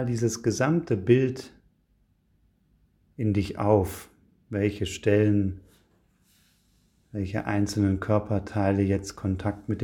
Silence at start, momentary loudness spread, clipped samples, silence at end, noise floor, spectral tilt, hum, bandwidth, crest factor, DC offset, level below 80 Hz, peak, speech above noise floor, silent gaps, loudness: 0 s; 11 LU; under 0.1%; 0 s; -67 dBFS; -7 dB/octave; 50 Hz at -50 dBFS; 16.5 kHz; 20 dB; under 0.1%; -52 dBFS; -6 dBFS; 42 dB; none; -26 LUFS